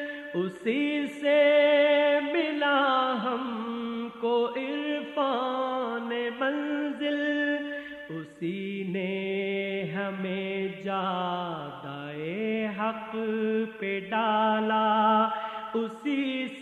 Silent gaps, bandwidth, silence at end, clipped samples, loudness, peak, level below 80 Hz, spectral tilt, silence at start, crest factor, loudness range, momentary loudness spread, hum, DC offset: none; 9.2 kHz; 0 s; under 0.1%; -28 LUFS; -12 dBFS; -74 dBFS; -6.5 dB/octave; 0 s; 16 dB; 7 LU; 11 LU; none; under 0.1%